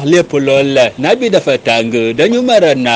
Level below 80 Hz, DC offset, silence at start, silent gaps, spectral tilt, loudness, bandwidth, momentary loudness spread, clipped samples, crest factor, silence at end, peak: -52 dBFS; under 0.1%; 0 s; none; -5 dB/octave; -11 LUFS; 9.8 kHz; 3 LU; under 0.1%; 10 dB; 0 s; 0 dBFS